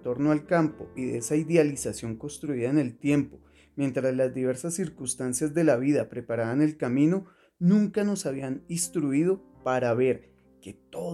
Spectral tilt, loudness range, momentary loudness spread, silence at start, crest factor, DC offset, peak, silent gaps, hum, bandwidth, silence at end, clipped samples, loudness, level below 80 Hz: -6 dB/octave; 3 LU; 11 LU; 0 s; 18 dB; under 0.1%; -8 dBFS; none; none; 14 kHz; 0 s; under 0.1%; -27 LUFS; -62 dBFS